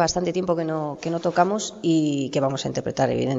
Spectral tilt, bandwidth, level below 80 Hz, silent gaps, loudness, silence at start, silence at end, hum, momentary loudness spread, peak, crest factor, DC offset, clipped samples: -5.5 dB/octave; 8 kHz; -54 dBFS; none; -24 LUFS; 0 s; 0 s; none; 6 LU; -4 dBFS; 18 dB; under 0.1%; under 0.1%